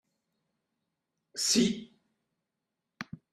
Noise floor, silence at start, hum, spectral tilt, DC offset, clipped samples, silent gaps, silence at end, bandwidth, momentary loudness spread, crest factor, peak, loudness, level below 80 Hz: -86 dBFS; 1.35 s; none; -3 dB/octave; under 0.1%; under 0.1%; none; 0.3 s; 15.5 kHz; 19 LU; 22 dB; -14 dBFS; -27 LUFS; -70 dBFS